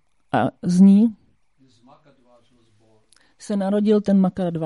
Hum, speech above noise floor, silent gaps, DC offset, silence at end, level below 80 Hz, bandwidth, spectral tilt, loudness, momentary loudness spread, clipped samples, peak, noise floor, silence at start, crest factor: none; 43 dB; none; under 0.1%; 0 s; -60 dBFS; 11 kHz; -8.5 dB/octave; -18 LUFS; 11 LU; under 0.1%; -4 dBFS; -60 dBFS; 0.35 s; 16 dB